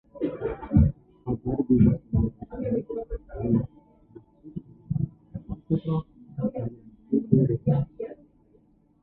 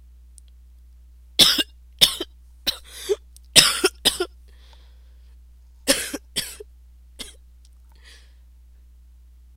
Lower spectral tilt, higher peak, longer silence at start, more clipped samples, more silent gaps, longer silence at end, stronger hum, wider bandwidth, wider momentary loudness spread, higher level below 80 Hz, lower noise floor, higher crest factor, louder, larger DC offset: first, -14 dB/octave vs -0.5 dB/octave; second, -6 dBFS vs 0 dBFS; second, 0.15 s vs 1.4 s; neither; neither; second, 0.9 s vs 2.25 s; second, none vs 60 Hz at -50 dBFS; second, 3.9 kHz vs 16.5 kHz; second, 17 LU vs 23 LU; first, -38 dBFS vs -46 dBFS; first, -61 dBFS vs -49 dBFS; about the same, 22 dB vs 26 dB; second, -27 LUFS vs -19 LUFS; neither